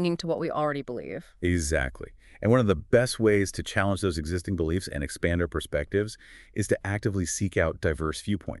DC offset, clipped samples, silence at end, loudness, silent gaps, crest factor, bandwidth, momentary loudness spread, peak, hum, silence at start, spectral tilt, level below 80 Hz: under 0.1%; under 0.1%; 0 s; -27 LUFS; none; 20 dB; 12 kHz; 11 LU; -8 dBFS; none; 0 s; -5.5 dB/octave; -42 dBFS